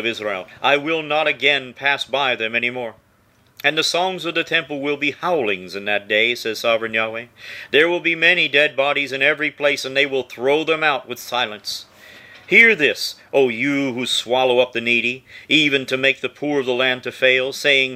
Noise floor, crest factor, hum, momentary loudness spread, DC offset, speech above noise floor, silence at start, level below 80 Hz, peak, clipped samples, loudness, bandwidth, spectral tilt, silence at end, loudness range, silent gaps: -57 dBFS; 20 dB; none; 9 LU; under 0.1%; 37 dB; 0 s; -66 dBFS; 0 dBFS; under 0.1%; -18 LUFS; 16 kHz; -3 dB/octave; 0 s; 4 LU; none